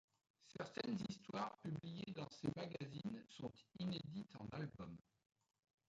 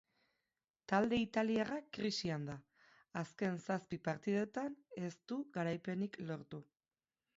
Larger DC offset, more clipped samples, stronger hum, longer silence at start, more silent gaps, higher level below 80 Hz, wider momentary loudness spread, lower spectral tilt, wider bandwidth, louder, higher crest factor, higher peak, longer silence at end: neither; neither; neither; second, 0.4 s vs 0.9 s; neither; about the same, -76 dBFS vs -74 dBFS; second, 8 LU vs 12 LU; first, -6.5 dB/octave vs -5 dB/octave; first, 9 kHz vs 7.6 kHz; second, -50 LUFS vs -40 LUFS; about the same, 20 dB vs 20 dB; second, -30 dBFS vs -20 dBFS; first, 0.9 s vs 0.75 s